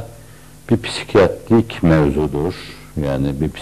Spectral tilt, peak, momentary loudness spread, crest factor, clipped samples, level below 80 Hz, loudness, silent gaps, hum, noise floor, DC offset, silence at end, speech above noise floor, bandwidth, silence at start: -7 dB/octave; -4 dBFS; 11 LU; 12 dB; under 0.1%; -36 dBFS; -17 LUFS; none; none; -41 dBFS; 0.7%; 0 s; 25 dB; 14 kHz; 0 s